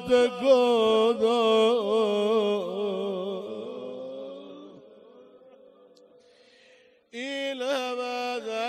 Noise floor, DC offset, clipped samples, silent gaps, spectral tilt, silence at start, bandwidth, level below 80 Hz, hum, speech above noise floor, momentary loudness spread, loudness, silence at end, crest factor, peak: -58 dBFS; under 0.1%; under 0.1%; none; -4.5 dB/octave; 0 s; 12.5 kHz; -70 dBFS; none; 36 dB; 17 LU; -25 LUFS; 0 s; 18 dB; -8 dBFS